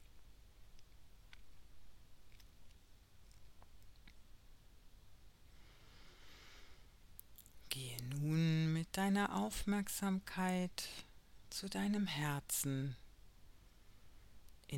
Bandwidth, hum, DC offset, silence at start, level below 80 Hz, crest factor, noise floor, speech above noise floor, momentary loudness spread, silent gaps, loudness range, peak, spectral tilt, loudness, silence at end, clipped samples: 16.5 kHz; none; under 0.1%; 0 s; -62 dBFS; 24 dB; -62 dBFS; 22 dB; 26 LU; none; 15 LU; -20 dBFS; -5 dB/octave; -40 LUFS; 0 s; under 0.1%